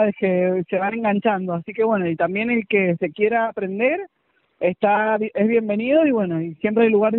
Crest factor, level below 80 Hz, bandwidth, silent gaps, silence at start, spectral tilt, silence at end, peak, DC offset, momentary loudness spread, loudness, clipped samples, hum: 14 dB; -62 dBFS; 4.1 kHz; none; 0 s; -5.5 dB/octave; 0 s; -4 dBFS; under 0.1%; 7 LU; -20 LUFS; under 0.1%; none